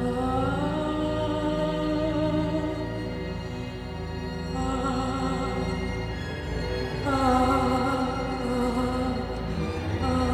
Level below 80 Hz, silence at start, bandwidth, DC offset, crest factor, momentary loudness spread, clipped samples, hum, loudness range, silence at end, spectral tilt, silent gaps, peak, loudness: -38 dBFS; 0 s; 13.5 kHz; under 0.1%; 16 dB; 9 LU; under 0.1%; none; 4 LU; 0 s; -6.5 dB/octave; none; -10 dBFS; -28 LUFS